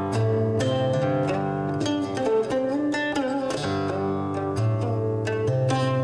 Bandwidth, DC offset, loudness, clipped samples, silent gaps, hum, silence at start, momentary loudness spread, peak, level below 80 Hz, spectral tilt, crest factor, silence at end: 10.5 kHz; under 0.1%; -25 LUFS; under 0.1%; none; none; 0 s; 3 LU; -12 dBFS; -56 dBFS; -7 dB/octave; 12 dB; 0 s